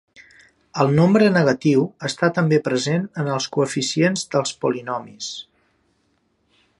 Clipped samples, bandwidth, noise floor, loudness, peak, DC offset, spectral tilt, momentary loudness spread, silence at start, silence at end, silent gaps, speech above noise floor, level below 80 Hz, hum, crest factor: under 0.1%; 11.5 kHz; -66 dBFS; -20 LUFS; -2 dBFS; under 0.1%; -5.5 dB/octave; 14 LU; 0.2 s; 1.35 s; none; 47 dB; -62 dBFS; none; 18 dB